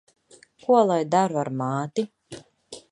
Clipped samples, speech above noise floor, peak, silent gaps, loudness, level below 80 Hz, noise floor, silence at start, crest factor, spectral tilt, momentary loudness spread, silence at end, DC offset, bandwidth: under 0.1%; 32 dB; -6 dBFS; none; -23 LUFS; -70 dBFS; -54 dBFS; 0.7 s; 20 dB; -6.5 dB/octave; 24 LU; 0.1 s; under 0.1%; 11 kHz